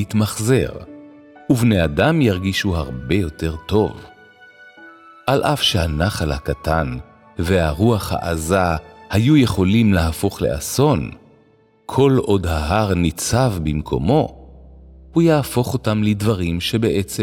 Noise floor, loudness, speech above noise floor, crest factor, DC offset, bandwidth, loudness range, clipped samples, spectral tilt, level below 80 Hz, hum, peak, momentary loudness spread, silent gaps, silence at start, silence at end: -54 dBFS; -18 LUFS; 37 dB; 16 dB; under 0.1%; 17 kHz; 4 LU; under 0.1%; -6 dB/octave; -34 dBFS; none; -2 dBFS; 9 LU; none; 0 s; 0 s